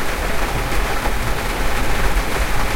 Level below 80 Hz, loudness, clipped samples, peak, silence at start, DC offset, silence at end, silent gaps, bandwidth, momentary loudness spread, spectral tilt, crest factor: -22 dBFS; -21 LUFS; under 0.1%; -4 dBFS; 0 s; under 0.1%; 0 s; none; 16.5 kHz; 1 LU; -4 dB/octave; 14 dB